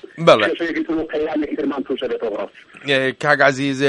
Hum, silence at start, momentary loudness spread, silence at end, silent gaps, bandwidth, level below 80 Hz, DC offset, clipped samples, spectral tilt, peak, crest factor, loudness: none; 0.15 s; 11 LU; 0 s; none; 11 kHz; -54 dBFS; under 0.1%; under 0.1%; -5 dB/octave; 0 dBFS; 18 dB; -18 LUFS